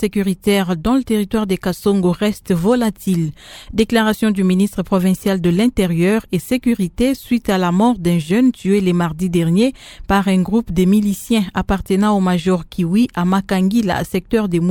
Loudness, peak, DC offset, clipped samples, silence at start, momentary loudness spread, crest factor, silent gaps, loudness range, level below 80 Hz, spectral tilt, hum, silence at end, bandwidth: -17 LUFS; 0 dBFS; under 0.1%; under 0.1%; 0 s; 4 LU; 16 dB; none; 1 LU; -38 dBFS; -6.5 dB/octave; none; 0 s; 18 kHz